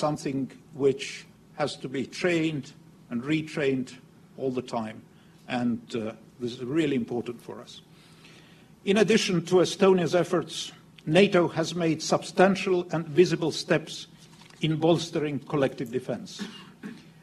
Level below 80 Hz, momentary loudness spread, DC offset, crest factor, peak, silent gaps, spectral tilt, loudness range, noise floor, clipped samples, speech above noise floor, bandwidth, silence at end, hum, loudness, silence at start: -66 dBFS; 18 LU; under 0.1%; 22 dB; -6 dBFS; none; -5.5 dB/octave; 8 LU; -53 dBFS; under 0.1%; 27 dB; 13 kHz; 0.2 s; none; -27 LUFS; 0 s